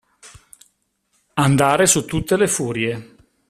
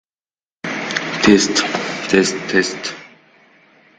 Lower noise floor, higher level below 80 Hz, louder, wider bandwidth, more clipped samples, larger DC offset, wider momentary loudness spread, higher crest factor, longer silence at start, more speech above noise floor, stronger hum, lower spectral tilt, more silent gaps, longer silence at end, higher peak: second, -67 dBFS vs under -90 dBFS; first, -46 dBFS vs -52 dBFS; about the same, -18 LUFS vs -17 LUFS; first, 15 kHz vs 9.6 kHz; neither; neither; second, 11 LU vs 14 LU; about the same, 20 dB vs 20 dB; second, 0.25 s vs 0.65 s; second, 50 dB vs over 74 dB; neither; about the same, -4 dB/octave vs -3.5 dB/octave; neither; second, 0.45 s vs 0.9 s; about the same, 0 dBFS vs 0 dBFS